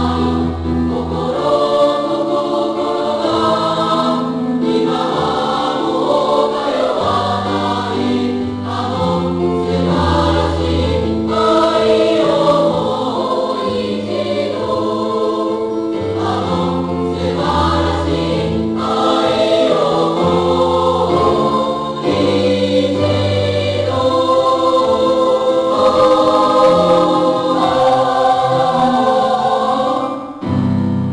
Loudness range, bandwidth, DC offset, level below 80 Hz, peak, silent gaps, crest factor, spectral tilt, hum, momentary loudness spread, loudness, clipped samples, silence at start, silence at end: 5 LU; 10.5 kHz; under 0.1%; -36 dBFS; -2 dBFS; none; 12 dB; -6.5 dB/octave; none; 6 LU; -15 LUFS; under 0.1%; 0 s; 0 s